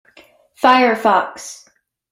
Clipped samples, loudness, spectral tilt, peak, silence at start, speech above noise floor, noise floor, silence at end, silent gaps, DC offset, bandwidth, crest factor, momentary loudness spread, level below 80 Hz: under 0.1%; -14 LUFS; -3 dB/octave; 0 dBFS; 0.6 s; 35 dB; -49 dBFS; 0.55 s; none; under 0.1%; 16 kHz; 18 dB; 20 LU; -64 dBFS